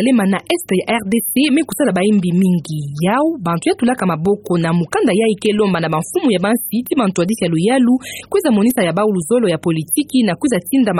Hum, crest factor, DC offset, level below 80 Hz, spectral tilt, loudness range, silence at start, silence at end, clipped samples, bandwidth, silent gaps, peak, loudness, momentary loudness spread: none; 12 dB; under 0.1%; -52 dBFS; -5.5 dB/octave; 1 LU; 0 s; 0 s; under 0.1%; 16 kHz; none; -2 dBFS; -16 LUFS; 4 LU